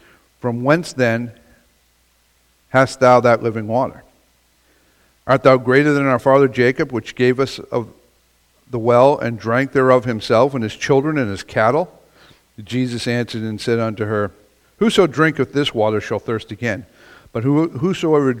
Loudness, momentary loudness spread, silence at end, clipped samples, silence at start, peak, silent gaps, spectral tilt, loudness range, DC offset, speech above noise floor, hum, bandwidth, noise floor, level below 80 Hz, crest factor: -17 LUFS; 12 LU; 0 s; under 0.1%; 0.45 s; 0 dBFS; none; -6.5 dB/octave; 4 LU; under 0.1%; 42 dB; none; 15.5 kHz; -59 dBFS; -52 dBFS; 18 dB